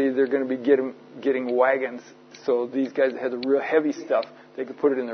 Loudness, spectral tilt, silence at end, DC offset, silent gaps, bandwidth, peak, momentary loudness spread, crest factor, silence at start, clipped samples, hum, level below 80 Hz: -24 LUFS; -6 dB/octave; 0 s; under 0.1%; none; 6.4 kHz; -6 dBFS; 12 LU; 18 dB; 0 s; under 0.1%; none; -80 dBFS